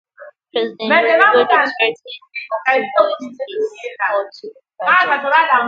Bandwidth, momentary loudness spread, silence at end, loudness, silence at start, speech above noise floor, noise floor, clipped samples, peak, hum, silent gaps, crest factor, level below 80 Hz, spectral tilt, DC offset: 7.6 kHz; 15 LU; 0 s; -15 LUFS; 0.2 s; 26 dB; -41 dBFS; under 0.1%; 0 dBFS; none; none; 16 dB; -72 dBFS; -4 dB/octave; under 0.1%